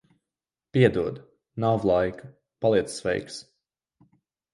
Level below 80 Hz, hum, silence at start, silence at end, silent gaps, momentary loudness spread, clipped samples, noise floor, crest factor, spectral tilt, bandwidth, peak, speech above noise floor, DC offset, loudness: -54 dBFS; none; 0.75 s; 1.1 s; none; 19 LU; under 0.1%; under -90 dBFS; 22 dB; -6.5 dB/octave; 11.5 kHz; -4 dBFS; over 66 dB; under 0.1%; -25 LUFS